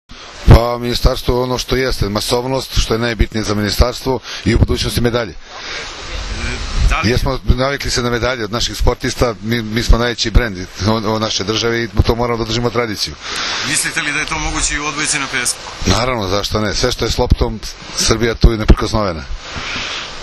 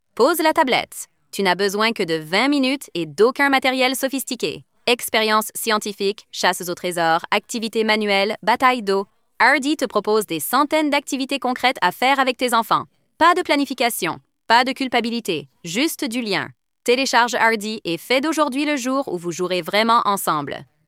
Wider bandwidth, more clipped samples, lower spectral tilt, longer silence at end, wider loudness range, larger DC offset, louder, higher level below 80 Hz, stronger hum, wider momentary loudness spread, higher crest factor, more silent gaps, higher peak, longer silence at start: second, 14 kHz vs 16.5 kHz; first, 0.3% vs under 0.1%; about the same, -4 dB/octave vs -3 dB/octave; second, 0 s vs 0.25 s; about the same, 2 LU vs 2 LU; neither; first, -16 LUFS vs -19 LUFS; first, -20 dBFS vs -66 dBFS; neither; about the same, 8 LU vs 9 LU; about the same, 16 dB vs 18 dB; neither; about the same, 0 dBFS vs -2 dBFS; about the same, 0.1 s vs 0.15 s